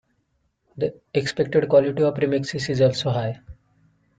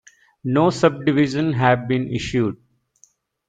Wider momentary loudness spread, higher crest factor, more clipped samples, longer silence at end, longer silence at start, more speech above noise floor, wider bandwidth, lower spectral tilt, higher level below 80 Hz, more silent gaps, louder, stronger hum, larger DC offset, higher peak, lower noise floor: first, 11 LU vs 7 LU; about the same, 18 dB vs 18 dB; neither; second, 0.65 s vs 0.95 s; first, 0.75 s vs 0.45 s; first, 49 dB vs 39 dB; about the same, 9.2 kHz vs 9.2 kHz; about the same, -6 dB/octave vs -6.5 dB/octave; second, -56 dBFS vs -50 dBFS; neither; second, -22 LUFS vs -19 LUFS; neither; neither; second, -6 dBFS vs -2 dBFS; first, -70 dBFS vs -58 dBFS